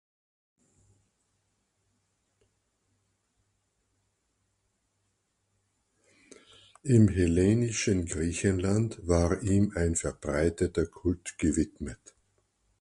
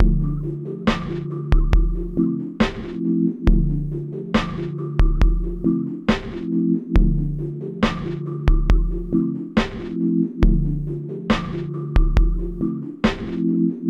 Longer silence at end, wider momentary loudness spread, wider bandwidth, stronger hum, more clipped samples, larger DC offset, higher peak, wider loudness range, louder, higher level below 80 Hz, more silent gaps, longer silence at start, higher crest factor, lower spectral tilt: first, 0.85 s vs 0 s; about the same, 9 LU vs 7 LU; first, 11.5 kHz vs 7.2 kHz; neither; neither; neither; second, -10 dBFS vs 0 dBFS; first, 4 LU vs 1 LU; second, -28 LUFS vs -23 LUFS; second, -44 dBFS vs -22 dBFS; neither; first, 6.85 s vs 0 s; about the same, 22 dB vs 20 dB; second, -6 dB/octave vs -8 dB/octave